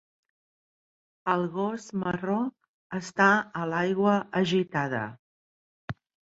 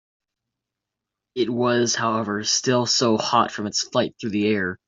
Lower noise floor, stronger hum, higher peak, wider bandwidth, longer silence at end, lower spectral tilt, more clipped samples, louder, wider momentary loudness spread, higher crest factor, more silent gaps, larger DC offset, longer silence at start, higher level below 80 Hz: first, under -90 dBFS vs -85 dBFS; neither; about the same, -6 dBFS vs -4 dBFS; about the same, 8 kHz vs 7.8 kHz; first, 0.45 s vs 0.15 s; first, -6 dB/octave vs -3.5 dB/octave; neither; second, -27 LUFS vs -21 LUFS; first, 18 LU vs 6 LU; about the same, 22 dB vs 18 dB; first, 2.69-2.90 s, 5.19-5.88 s vs none; neither; about the same, 1.25 s vs 1.35 s; about the same, -66 dBFS vs -66 dBFS